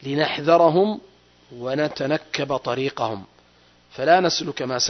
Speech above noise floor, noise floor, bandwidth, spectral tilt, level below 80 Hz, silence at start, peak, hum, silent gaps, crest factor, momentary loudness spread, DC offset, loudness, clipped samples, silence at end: 35 dB; -56 dBFS; 6.4 kHz; -4 dB/octave; -62 dBFS; 0 s; -4 dBFS; 60 Hz at -60 dBFS; none; 18 dB; 12 LU; under 0.1%; -21 LUFS; under 0.1%; 0 s